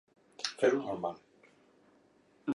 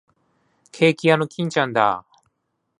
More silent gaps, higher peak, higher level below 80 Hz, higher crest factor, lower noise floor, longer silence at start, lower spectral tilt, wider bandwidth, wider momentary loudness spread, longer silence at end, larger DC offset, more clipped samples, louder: neither; second, -16 dBFS vs -2 dBFS; second, -78 dBFS vs -66 dBFS; about the same, 20 dB vs 20 dB; second, -67 dBFS vs -75 dBFS; second, 0.4 s vs 0.75 s; second, -4 dB/octave vs -5.5 dB/octave; about the same, 11.5 kHz vs 11 kHz; first, 13 LU vs 6 LU; second, 0 s vs 0.8 s; neither; neither; second, -34 LUFS vs -20 LUFS